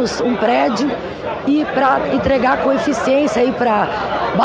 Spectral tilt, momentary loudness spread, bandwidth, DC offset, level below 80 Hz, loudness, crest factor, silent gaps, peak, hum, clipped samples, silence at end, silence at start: -5.5 dB/octave; 5 LU; 9.6 kHz; under 0.1%; -42 dBFS; -16 LUFS; 14 dB; none; -2 dBFS; none; under 0.1%; 0 s; 0 s